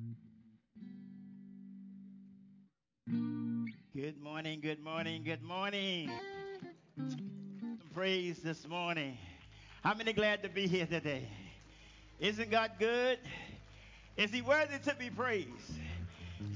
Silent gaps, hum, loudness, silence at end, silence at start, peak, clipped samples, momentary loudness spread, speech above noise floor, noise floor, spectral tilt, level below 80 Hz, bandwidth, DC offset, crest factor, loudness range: none; none; -38 LUFS; 0 s; 0 s; -20 dBFS; under 0.1%; 22 LU; 32 dB; -68 dBFS; -5 dB/octave; -62 dBFS; 7.6 kHz; under 0.1%; 20 dB; 9 LU